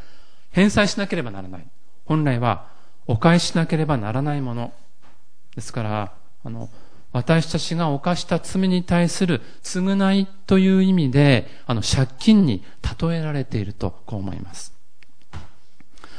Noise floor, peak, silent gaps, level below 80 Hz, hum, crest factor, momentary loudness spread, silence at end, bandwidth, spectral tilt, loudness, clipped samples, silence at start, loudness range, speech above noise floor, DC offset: -59 dBFS; -2 dBFS; none; -42 dBFS; none; 18 dB; 20 LU; 0 s; 10.5 kHz; -6 dB/octave; -21 LUFS; under 0.1%; 0 s; 9 LU; 38 dB; 3%